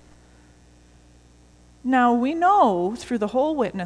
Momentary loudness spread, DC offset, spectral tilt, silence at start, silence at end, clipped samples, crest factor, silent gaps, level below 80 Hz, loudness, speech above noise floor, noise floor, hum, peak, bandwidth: 9 LU; under 0.1%; -6 dB/octave; 1.85 s; 0 s; under 0.1%; 16 dB; none; -54 dBFS; -21 LUFS; 32 dB; -52 dBFS; 60 Hz at -40 dBFS; -6 dBFS; 11 kHz